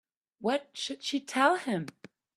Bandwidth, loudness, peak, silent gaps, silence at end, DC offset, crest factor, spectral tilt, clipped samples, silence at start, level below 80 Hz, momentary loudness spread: 13.5 kHz; -30 LUFS; -10 dBFS; none; 0.45 s; under 0.1%; 22 dB; -4 dB/octave; under 0.1%; 0.4 s; -80 dBFS; 10 LU